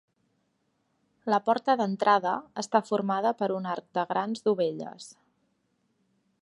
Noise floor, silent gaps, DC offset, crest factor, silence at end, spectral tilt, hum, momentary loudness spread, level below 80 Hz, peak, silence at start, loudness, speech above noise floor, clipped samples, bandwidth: -74 dBFS; none; under 0.1%; 22 dB; 1.35 s; -5.5 dB/octave; none; 14 LU; -80 dBFS; -8 dBFS; 1.25 s; -27 LUFS; 47 dB; under 0.1%; 11.5 kHz